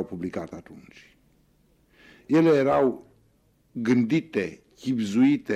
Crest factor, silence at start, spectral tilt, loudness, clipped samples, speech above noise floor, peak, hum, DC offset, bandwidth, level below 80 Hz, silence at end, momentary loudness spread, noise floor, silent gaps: 16 dB; 0 s; -7 dB/octave; -24 LUFS; under 0.1%; 40 dB; -10 dBFS; none; under 0.1%; 9.8 kHz; -62 dBFS; 0 s; 19 LU; -64 dBFS; none